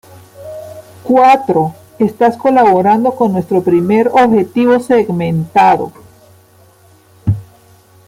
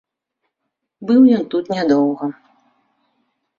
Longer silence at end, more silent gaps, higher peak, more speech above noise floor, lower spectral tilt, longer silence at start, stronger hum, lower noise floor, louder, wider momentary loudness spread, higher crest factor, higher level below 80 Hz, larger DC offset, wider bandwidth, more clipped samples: second, 0.65 s vs 1.25 s; neither; about the same, 0 dBFS vs -2 dBFS; second, 35 dB vs 62 dB; about the same, -7.5 dB/octave vs -7.5 dB/octave; second, 0.4 s vs 1 s; neither; second, -46 dBFS vs -77 dBFS; first, -12 LUFS vs -16 LUFS; about the same, 17 LU vs 15 LU; about the same, 12 dB vs 16 dB; first, -48 dBFS vs -64 dBFS; neither; first, 16 kHz vs 7 kHz; neither